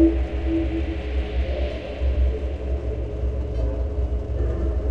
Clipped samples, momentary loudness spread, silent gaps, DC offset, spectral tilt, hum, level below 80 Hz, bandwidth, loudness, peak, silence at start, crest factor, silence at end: under 0.1%; 4 LU; none; 0.5%; -9 dB/octave; none; -24 dBFS; 5 kHz; -26 LUFS; -6 dBFS; 0 s; 16 dB; 0 s